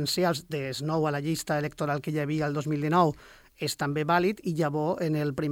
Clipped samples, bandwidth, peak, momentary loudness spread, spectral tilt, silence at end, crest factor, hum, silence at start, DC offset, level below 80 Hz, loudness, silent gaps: under 0.1%; 17 kHz; -10 dBFS; 7 LU; -5.5 dB/octave; 0 s; 18 dB; none; 0 s; under 0.1%; -60 dBFS; -28 LUFS; none